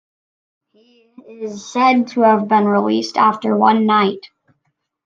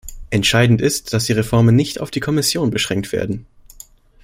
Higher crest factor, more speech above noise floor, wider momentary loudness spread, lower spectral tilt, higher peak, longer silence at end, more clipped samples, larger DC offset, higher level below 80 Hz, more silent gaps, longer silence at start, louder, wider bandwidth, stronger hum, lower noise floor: about the same, 16 dB vs 16 dB; first, 55 dB vs 27 dB; first, 16 LU vs 9 LU; about the same, -6 dB/octave vs -5 dB/octave; about the same, -2 dBFS vs 0 dBFS; about the same, 0.8 s vs 0.8 s; neither; neither; second, -70 dBFS vs -40 dBFS; neither; first, 1.3 s vs 0.05 s; about the same, -15 LUFS vs -17 LUFS; second, 7.6 kHz vs 16 kHz; neither; first, -70 dBFS vs -44 dBFS